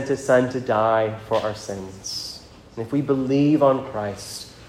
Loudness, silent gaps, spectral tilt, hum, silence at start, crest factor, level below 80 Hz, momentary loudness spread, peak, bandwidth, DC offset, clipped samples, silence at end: -22 LUFS; none; -5.5 dB/octave; none; 0 s; 18 dB; -54 dBFS; 15 LU; -4 dBFS; 15 kHz; under 0.1%; under 0.1%; 0 s